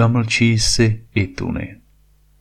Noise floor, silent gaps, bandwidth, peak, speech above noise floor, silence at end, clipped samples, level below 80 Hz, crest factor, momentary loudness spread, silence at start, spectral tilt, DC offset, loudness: -54 dBFS; none; 13.5 kHz; -2 dBFS; 36 dB; 0.65 s; under 0.1%; -34 dBFS; 16 dB; 12 LU; 0 s; -4.5 dB/octave; under 0.1%; -18 LUFS